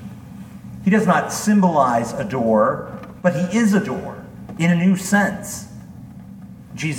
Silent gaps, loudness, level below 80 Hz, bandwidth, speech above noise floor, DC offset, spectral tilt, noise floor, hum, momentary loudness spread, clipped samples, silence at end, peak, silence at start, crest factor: none; -19 LUFS; -52 dBFS; 16.5 kHz; 21 dB; under 0.1%; -6 dB/octave; -38 dBFS; none; 22 LU; under 0.1%; 0 s; -2 dBFS; 0 s; 18 dB